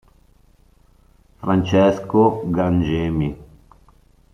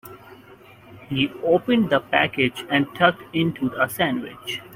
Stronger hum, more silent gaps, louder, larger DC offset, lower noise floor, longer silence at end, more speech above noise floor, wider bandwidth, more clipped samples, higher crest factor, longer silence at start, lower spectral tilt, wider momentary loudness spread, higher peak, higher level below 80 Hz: neither; neither; first, -19 LUFS vs -22 LUFS; neither; first, -54 dBFS vs -47 dBFS; first, 0.9 s vs 0 s; first, 36 dB vs 25 dB; second, 9.4 kHz vs 16 kHz; neither; about the same, 18 dB vs 20 dB; first, 1.4 s vs 0.05 s; first, -8 dB/octave vs -5.5 dB/octave; about the same, 10 LU vs 10 LU; about the same, -2 dBFS vs -2 dBFS; first, -44 dBFS vs -58 dBFS